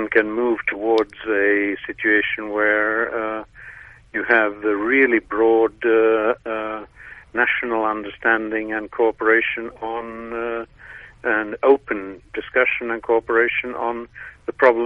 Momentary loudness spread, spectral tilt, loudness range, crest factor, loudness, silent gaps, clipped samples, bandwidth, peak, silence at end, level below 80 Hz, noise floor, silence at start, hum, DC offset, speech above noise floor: 14 LU; -6.5 dB/octave; 4 LU; 20 dB; -20 LUFS; none; under 0.1%; 5.8 kHz; 0 dBFS; 0 s; -54 dBFS; -42 dBFS; 0 s; none; under 0.1%; 22 dB